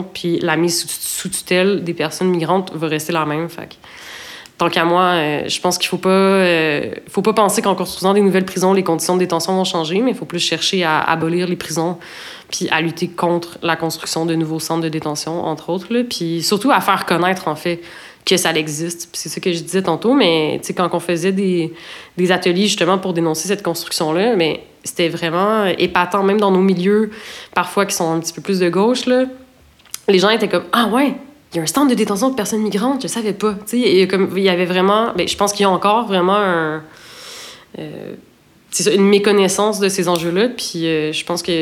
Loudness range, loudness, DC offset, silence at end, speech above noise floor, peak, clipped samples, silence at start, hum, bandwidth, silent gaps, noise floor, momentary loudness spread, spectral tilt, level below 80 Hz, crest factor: 4 LU; -17 LUFS; under 0.1%; 0 s; 31 dB; 0 dBFS; under 0.1%; 0 s; none; 16.5 kHz; none; -48 dBFS; 10 LU; -4 dB/octave; -58 dBFS; 16 dB